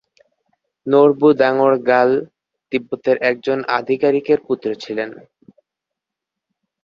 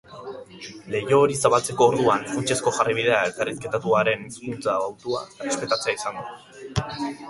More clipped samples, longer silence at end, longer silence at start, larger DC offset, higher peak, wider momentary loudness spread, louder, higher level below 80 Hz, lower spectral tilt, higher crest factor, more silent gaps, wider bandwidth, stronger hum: neither; first, 1.7 s vs 0 s; first, 0.85 s vs 0.1 s; neither; about the same, -2 dBFS vs -2 dBFS; second, 11 LU vs 19 LU; first, -17 LUFS vs -23 LUFS; second, -64 dBFS vs -52 dBFS; first, -7 dB/octave vs -4 dB/octave; second, 16 dB vs 22 dB; neither; second, 7 kHz vs 12 kHz; neither